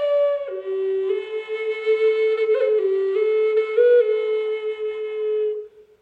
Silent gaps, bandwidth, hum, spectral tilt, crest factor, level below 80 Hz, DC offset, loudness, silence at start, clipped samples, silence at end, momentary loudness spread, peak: none; 4.7 kHz; none; -4 dB/octave; 14 dB; -74 dBFS; under 0.1%; -21 LUFS; 0 s; under 0.1%; 0.2 s; 10 LU; -8 dBFS